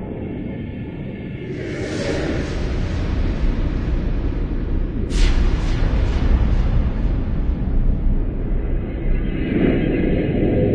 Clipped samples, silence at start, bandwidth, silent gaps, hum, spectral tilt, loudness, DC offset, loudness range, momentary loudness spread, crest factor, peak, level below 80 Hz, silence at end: under 0.1%; 0 s; 8.6 kHz; none; none; -7.5 dB/octave; -22 LUFS; under 0.1%; 3 LU; 9 LU; 14 dB; -4 dBFS; -20 dBFS; 0 s